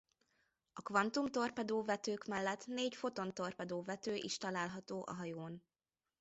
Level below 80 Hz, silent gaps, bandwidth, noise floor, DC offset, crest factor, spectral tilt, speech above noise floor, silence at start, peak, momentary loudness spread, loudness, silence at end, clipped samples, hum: -80 dBFS; none; 8 kHz; under -90 dBFS; under 0.1%; 22 dB; -3.5 dB/octave; over 49 dB; 0.75 s; -20 dBFS; 9 LU; -41 LUFS; 0.6 s; under 0.1%; none